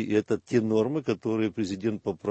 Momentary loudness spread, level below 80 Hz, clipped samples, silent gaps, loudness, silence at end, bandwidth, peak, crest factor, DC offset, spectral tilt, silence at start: 5 LU; -64 dBFS; under 0.1%; none; -28 LUFS; 0 s; 8.6 kHz; -10 dBFS; 16 dB; under 0.1%; -7 dB/octave; 0 s